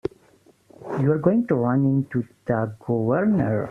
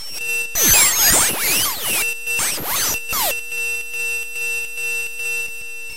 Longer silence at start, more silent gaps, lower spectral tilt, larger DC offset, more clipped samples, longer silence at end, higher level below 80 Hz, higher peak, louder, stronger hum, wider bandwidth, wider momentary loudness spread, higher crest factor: about the same, 0.05 s vs 0 s; neither; first, -11 dB/octave vs 0.5 dB/octave; second, under 0.1% vs 3%; neither; about the same, 0 s vs 0 s; second, -58 dBFS vs -42 dBFS; second, -4 dBFS vs 0 dBFS; second, -22 LUFS vs -17 LUFS; neither; second, 5.8 kHz vs 16 kHz; about the same, 9 LU vs 11 LU; about the same, 18 dB vs 20 dB